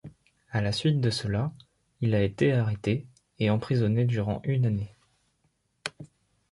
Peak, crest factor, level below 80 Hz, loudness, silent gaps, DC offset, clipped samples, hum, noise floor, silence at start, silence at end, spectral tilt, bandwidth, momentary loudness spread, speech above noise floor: -8 dBFS; 20 dB; -52 dBFS; -28 LUFS; none; under 0.1%; under 0.1%; none; -72 dBFS; 0.05 s; 0.45 s; -7 dB/octave; 11.5 kHz; 11 LU; 47 dB